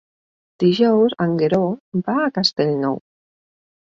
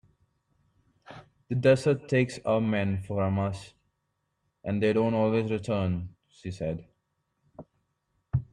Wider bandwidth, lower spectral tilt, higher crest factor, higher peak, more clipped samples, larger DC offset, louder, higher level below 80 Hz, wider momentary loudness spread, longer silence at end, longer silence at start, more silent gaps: second, 7.6 kHz vs 11.5 kHz; about the same, -6.5 dB/octave vs -7.5 dB/octave; about the same, 16 dB vs 20 dB; first, -4 dBFS vs -10 dBFS; neither; neither; first, -19 LUFS vs -28 LUFS; about the same, -60 dBFS vs -58 dBFS; second, 8 LU vs 17 LU; first, 0.9 s vs 0.1 s; second, 0.6 s vs 1.1 s; first, 1.80-1.92 s vs none